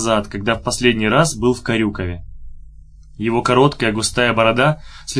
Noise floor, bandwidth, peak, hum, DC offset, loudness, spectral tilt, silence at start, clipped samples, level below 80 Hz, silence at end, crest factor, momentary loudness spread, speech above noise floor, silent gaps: -40 dBFS; 11 kHz; 0 dBFS; none; under 0.1%; -17 LUFS; -4.5 dB/octave; 0 s; under 0.1%; -36 dBFS; 0 s; 18 dB; 11 LU; 23 dB; none